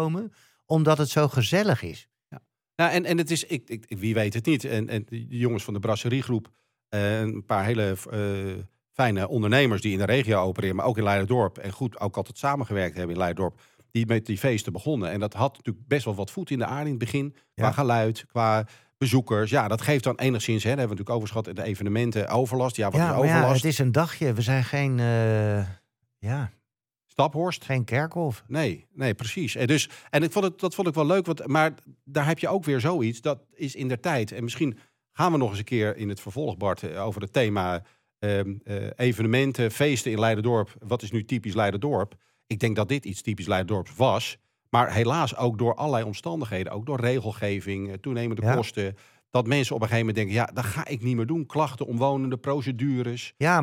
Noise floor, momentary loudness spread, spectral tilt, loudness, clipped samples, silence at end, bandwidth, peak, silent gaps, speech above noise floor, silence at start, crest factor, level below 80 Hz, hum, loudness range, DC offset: -84 dBFS; 9 LU; -6 dB/octave; -26 LUFS; under 0.1%; 0 s; 17 kHz; -6 dBFS; none; 59 dB; 0 s; 20 dB; -62 dBFS; none; 4 LU; under 0.1%